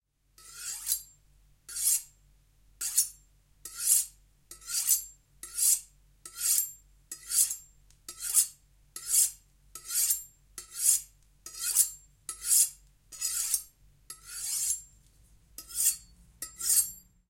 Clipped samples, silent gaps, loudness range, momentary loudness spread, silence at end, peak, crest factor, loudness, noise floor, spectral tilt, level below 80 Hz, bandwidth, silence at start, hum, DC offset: under 0.1%; none; 4 LU; 22 LU; 0.3 s; -8 dBFS; 24 dB; -27 LUFS; -63 dBFS; 3 dB/octave; -64 dBFS; 16.5 kHz; 0.45 s; none; under 0.1%